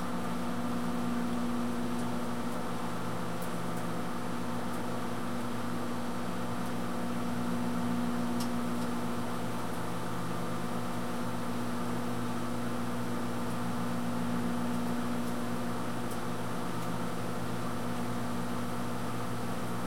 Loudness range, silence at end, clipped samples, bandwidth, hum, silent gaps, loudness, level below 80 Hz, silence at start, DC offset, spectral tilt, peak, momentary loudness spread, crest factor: 2 LU; 0 s; under 0.1%; 16.5 kHz; 60 Hz at -40 dBFS; none; -35 LUFS; -56 dBFS; 0 s; 2%; -5.5 dB/octave; -20 dBFS; 3 LU; 14 dB